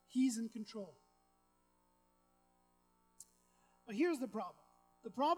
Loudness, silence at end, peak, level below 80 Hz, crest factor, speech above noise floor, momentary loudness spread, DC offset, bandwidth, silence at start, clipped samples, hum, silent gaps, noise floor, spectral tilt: -41 LUFS; 0 s; -22 dBFS; -84 dBFS; 20 dB; 38 dB; 24 LU; under 0.1%; 15.5 kHz; 0.1 s; under 0.1%; 60 Hz at -80 dBFS; none; -76 dBFS; -4.5 dB/octave